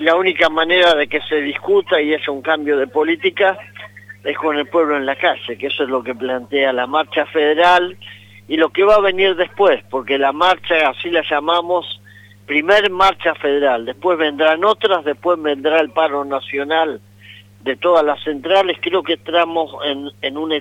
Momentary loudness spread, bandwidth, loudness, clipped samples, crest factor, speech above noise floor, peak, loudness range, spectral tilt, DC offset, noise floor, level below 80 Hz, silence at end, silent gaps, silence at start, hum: 10 LU; 12 kHz; -16 LUFS; under 0.1%; 16 dB; 26 dB; 0 dBFS; 3 LU; -4.5 dB/octave; under 0.1%; -42 dBFS; -52 dBFS; 0 s; none; 0 s; 50 Hz at -50 dBFS